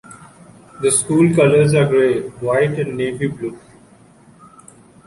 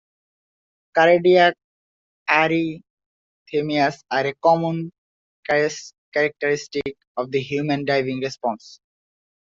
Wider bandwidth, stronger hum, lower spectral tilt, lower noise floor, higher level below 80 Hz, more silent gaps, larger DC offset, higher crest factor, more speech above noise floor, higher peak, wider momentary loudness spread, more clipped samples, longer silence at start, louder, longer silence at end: first, 11.5 kHz vs 7.6 kHz; neither; about the same, -5.5 dB/octave vs -5.5 dB/octave; second, -47 dBFS vs under -90 dBFS; first, -52 dBFS vs -64 dBFS; second, none vs 1.64-2.26 s, 2.90-2.97 s, 3.06-3.46 s, 4.98-5.43 s, 5.98-6.12 s, 7.07-7.15 s; neither; about the same, 16 dB vs 20 dB; second, 32 dB vs over 70 dB; about the same, -2 dBFS vs -2 dBFS; second, 11 LU vs 14 LU; neither; second, 0.1 s vs 0.95 s; first, -16 LUFS vs -21 LUFS; first, 1.5 s vs 0.7 s